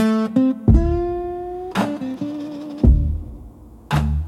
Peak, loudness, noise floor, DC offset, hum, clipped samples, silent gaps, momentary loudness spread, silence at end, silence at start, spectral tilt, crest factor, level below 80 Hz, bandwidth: -2 dBFS; -21 LUFS; -40 dBFS; under 0.1%; none; under 0.1%; none; 13 LU; 0 s; 0 s; -8 dB/octave; 18 dB; -24 dBFS; 12.5 kHz